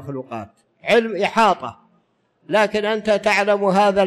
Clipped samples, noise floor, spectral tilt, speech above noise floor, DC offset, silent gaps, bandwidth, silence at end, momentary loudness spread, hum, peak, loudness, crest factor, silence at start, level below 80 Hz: under 0.1%; -63 dBFS; -5 dB/octave; 45 dB; under 0.1%; none; 13.5 kHz; 0 s; 14 LU; none; -6 dBFS; -18 LUFS; 14 dB; 0 s; -58 dBFS